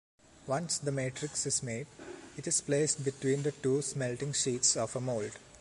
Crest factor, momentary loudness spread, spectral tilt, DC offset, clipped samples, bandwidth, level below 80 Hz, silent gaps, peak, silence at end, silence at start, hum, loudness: 18 dB; 14 LU; -3.5 dB/octave; under 0.1%; under 0.1%; 11.5 kHz; -66 dBFS; none; -14 dBFS; 0 s; 0.35 s; none; -32 LUFS